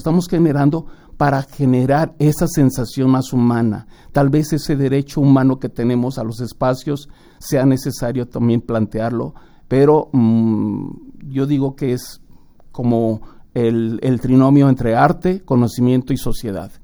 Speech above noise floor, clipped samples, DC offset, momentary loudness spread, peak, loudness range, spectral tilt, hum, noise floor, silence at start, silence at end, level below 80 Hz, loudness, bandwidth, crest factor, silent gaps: 26 dB; under 0.1%; under 0.1%; 12 LU; 0 dBFS; 4 LU; -7.5 dB/octave; none; -42 dBFS; 0 s; 0.05 s; -38 dBFS; -17 LUFS; over 20 kHz; 16 dB; none